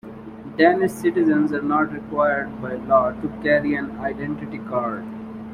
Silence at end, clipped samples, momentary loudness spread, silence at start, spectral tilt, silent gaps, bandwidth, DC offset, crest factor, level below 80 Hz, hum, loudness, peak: 0 s; under 0.1%; 14 LU; 0.05 s; -7 dB/octave; none; 15 kHz; under 0.1%; 18 dB; -52 dBFS; none; -21 LUFS; -2 dBFS